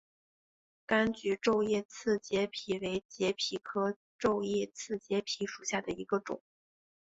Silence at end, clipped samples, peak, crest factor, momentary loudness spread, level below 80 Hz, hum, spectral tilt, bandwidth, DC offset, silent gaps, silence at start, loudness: 0.65 s; under 0.1%; -16 dBFS; 18 dB; 7 LU; -68 dBFS; none; -4 dB/octave; 8 kHz; under 0.1%; 1.85-1.89 s, 3.05-3.09 s, 3.96-4.19 s; 0.9 s; -34 LUFS